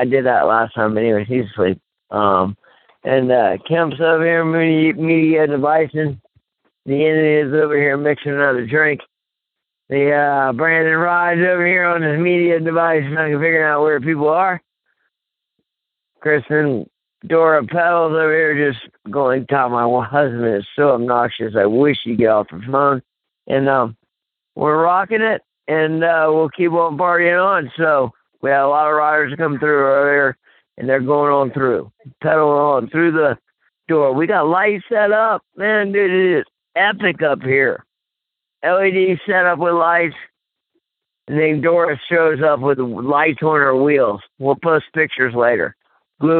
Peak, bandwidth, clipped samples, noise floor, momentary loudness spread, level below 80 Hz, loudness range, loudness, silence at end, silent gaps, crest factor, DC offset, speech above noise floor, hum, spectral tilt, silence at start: -2 dBFS; 4.3 kHz; under 0.1%; -82 dBFS; 6 LU; -62 dBFS; 3 LU; -16 LUFS; 0 s; none; 14 dB; under 0.1%; 67 dB; none; -11 dB/octave; 0 s